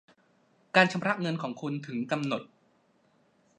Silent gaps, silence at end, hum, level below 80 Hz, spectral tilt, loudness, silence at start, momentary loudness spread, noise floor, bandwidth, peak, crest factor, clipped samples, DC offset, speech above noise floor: none; 1.1 s; none; -80 dBFS; -5.5 dB/octave; -29 LUFS; 0.75 s; 11 LU; -67 dBFS; 10.5 kHz; -6 dBFS; 26 dB; under 0.1%; under 0.1%; 39 dB